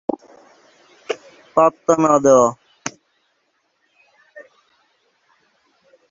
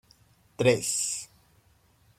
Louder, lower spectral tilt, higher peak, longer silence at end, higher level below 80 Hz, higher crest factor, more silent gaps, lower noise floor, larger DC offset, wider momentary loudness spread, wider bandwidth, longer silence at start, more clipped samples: first, -17 LUFS vs -26 LUFS; first, -5 dB/octave vs -3.5 dB/octave; first, 0 dBFS vs -8 dBFS; first, 1.7 s vs 0.95 s; about the same, -62 dBFS vs -64 dBFS; about the same, 20 dB vs 24 dB; neither; first, -67 dBFS vs -63 dBFS; neither; first, 19 LU vs 13 LU; second, 7.8 kHz vs 16 kHz; first, 1.1 s vs 0.6 s; neither